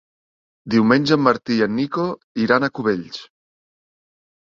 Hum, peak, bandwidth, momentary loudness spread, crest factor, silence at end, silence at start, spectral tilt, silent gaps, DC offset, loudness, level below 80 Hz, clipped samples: none; -2 dBFS; 7.4 kHz; 10 LU; 20 dB; 1.25 s; 0.65 s; -6.5 dB/octave; 2.24-2.35 s; under 0.1%; -19 LUFS; -60 dBFS; under 0.1%